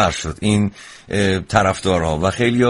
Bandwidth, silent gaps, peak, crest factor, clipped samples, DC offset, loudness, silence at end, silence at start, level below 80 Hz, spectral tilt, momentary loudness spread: 11.5 kHz; none; 0 dBFS; 18 dB; under 0.1%; under 0.1%; -18 LUFS; 0 s; 0 s; -38 dBFS; -5.5 dB/octave; 7 LU